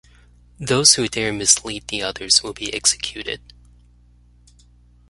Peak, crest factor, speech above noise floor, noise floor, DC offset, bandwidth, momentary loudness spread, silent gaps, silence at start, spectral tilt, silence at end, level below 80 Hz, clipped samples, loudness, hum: 0 dBFS; 22 dB; 32 dB; -52 dBFS; under 0.1%; 16 kHz; 16 LU; none; 0.6 s; -1.5 dB/octave; 1.75 s; -48 dBFS; under 0.1%; -17 LUFS; 60 Hz at -45 dBFS